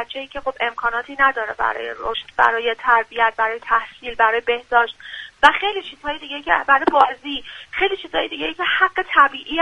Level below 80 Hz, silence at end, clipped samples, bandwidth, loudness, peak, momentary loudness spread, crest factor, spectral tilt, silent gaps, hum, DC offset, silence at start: -50 dBFS; 0 s; under 0.1%; 11 kHz; -19 LUFS; 0 dBFS; 12 LU; 20 dB; -3 dB/octave; none; none; under 0.1%; 0 s